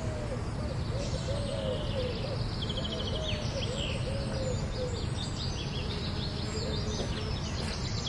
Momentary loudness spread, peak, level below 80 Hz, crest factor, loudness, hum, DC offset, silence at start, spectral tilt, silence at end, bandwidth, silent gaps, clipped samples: 2 LU; -20 dBFS; -40 dBFS; 14 dB; -34 LUFS; none; under 0.1%; 0 s; -5 dB/octave; 0 s; 11.5 kHz; none; under 0.1%